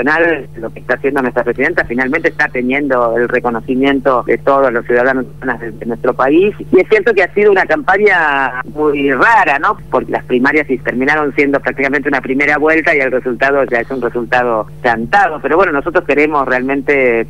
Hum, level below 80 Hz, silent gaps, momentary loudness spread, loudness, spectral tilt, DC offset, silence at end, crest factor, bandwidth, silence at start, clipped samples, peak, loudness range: none; -40 dBFS; none; 7 LU; -12 LUFS; -6.5 dB/octave; 2%; 0 s; 12 dB; 12.5 kHz; 0 s; under 0.1%; 0 dBFS; 3 LU